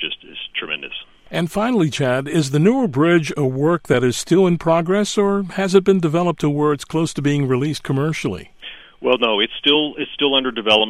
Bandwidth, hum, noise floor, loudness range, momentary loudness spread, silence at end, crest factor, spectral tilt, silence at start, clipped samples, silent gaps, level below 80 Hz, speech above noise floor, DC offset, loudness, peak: 14.5 kHz; none; -39 dBFS; 3 LU; 10 LU; 0 s; 18 dB; -5.5 dB/octave; 0 s; under 0.1%; none; -50 dBFS; 21 dB; under 0.1%; -18 LUFS; 0 dBFS